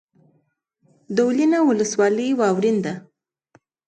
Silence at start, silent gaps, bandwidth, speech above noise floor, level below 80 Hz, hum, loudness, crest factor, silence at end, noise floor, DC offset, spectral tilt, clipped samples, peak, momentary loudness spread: 1.1 s; none; 9.2 kHz; 48 dB; -70 dBFS; none; -20 LUFS; 16 dB; 0.9 s; -67 dBFS; under 0.1%; -5.5 dB/octave; under 0.1%; -6 dBFS; 8 LU